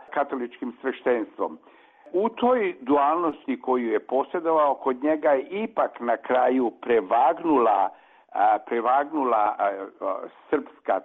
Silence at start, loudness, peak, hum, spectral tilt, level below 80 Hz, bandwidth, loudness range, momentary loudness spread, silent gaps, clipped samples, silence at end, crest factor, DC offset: 0.1 s; -24 LUFS; -12 dBFS; none; -7.5 dB/octave; -70 dBFS; 4 kHz; 3 LU; 10 LU; none; under 0.1%; 0.05 s; 12 dB; under 0.1%